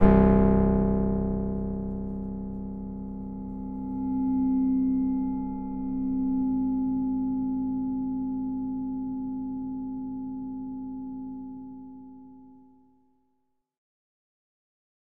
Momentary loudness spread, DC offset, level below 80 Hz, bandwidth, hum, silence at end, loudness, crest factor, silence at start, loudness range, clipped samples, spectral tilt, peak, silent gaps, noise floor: 13 LU; 0.2%; -38 dBFS; 3.2 kHz; none; 2.5 s; -28 LUFS; 22 dB; 0 s; 13 LU; under 0.1%; -12.5 dB/octave; -6 dBFS; none; -76 dBFS